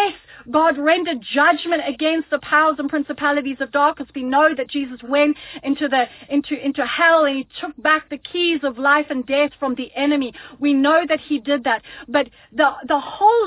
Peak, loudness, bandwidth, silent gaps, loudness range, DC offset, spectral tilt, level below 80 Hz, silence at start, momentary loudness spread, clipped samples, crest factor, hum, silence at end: -4 dBFS; -19 LUFS; 4 kHz; none; 2 LU; under 0.1%; -7 dB/octave; -58 dBFS; 0 s; 8 LU; under 0.1%; 16 dB; none; 0 s